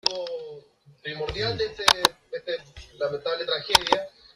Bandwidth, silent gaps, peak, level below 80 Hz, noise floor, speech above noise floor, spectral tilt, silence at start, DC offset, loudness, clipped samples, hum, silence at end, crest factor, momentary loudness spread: 13.5 kHz; none; 0 dBFS; -52 dBFS; -51 dBFS; 26 dB; -2 dB/octave; 0.05 s; under 0.1%; -25 LUFS; under 0.1%; none; 0.25 s; 26 dB; 16 LU